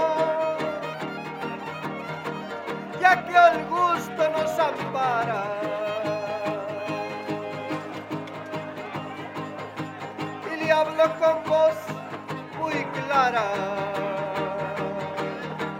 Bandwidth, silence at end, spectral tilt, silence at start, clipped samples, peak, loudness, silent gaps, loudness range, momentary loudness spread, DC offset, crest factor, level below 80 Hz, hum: 16.5 kHz; 0 s; -5.5 dB/octave; 0 s; under 0.1%; -4 dBFS; -26 LUFS; none; 10 LU; 13 LU; under 0.1%; 22 dB; -70 dBFS; none